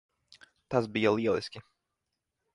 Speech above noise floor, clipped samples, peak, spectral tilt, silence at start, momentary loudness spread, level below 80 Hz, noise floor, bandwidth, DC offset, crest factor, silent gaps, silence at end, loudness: 56 dB; under 0.1%; -12 dBFS; -6.5 dB/octave; 0.7 s; 15 LU; -66 dBFS; -85 dBFS; 11.5 kHz; under 0.1%; 22 dB; none; 0.95 s; -29 LUFS